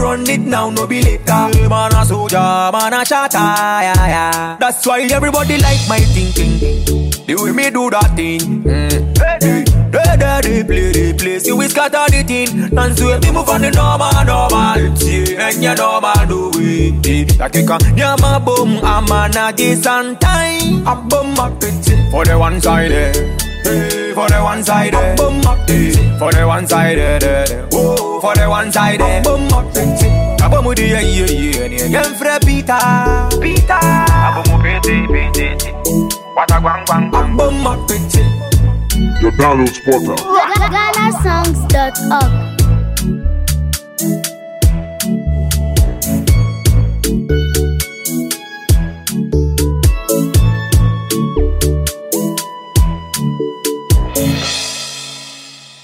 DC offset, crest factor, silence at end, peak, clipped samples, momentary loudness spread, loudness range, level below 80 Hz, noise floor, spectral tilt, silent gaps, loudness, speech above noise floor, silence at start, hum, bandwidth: under 0.1%; 12 dB; 0.2 s; 0 dBFS; under 0.1%; 5 LU; 3 LU; -18 dBFS; -35 dBFS; -5 dB/octave; none; -13 LUFS; 23 dB; 0 s; none; 16.5 kHz